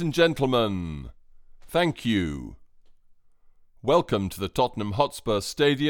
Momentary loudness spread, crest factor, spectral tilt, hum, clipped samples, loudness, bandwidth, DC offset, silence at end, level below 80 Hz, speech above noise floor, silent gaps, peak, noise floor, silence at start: 13 LU; 20 dB; -5.5 dB/octave; none; under 0.1%; -25 LUFS; 19 kHz; under 0.1%; 0 s; -48 dBFS; 31 dB; none; -6 dBFS; -55 dBFS; 0 s